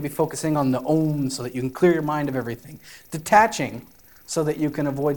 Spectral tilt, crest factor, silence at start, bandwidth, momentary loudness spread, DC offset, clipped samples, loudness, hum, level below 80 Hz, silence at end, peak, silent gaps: -5.5 dB/octave; 20 dB; 0 s; 18 kHz; 16 LU; 0.2%; under 0.1%; -23 LUFS; none; -58 dBFS; 0 s; -4 dBFS; none